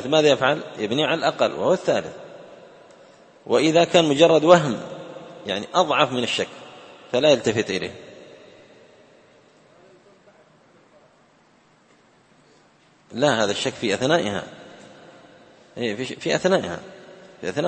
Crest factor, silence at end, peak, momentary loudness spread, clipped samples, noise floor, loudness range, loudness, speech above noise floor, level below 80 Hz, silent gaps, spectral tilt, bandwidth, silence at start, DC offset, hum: 24 dB; 0 s; 0 dBFS; 22 LU; under 0.1%; -57 dBFS; 9 LU; -21 LUFS; 37 dB; -64 dBFS; none; -4.5 dB/octave; 8.8 kHz; 0 s; under 0.1%; none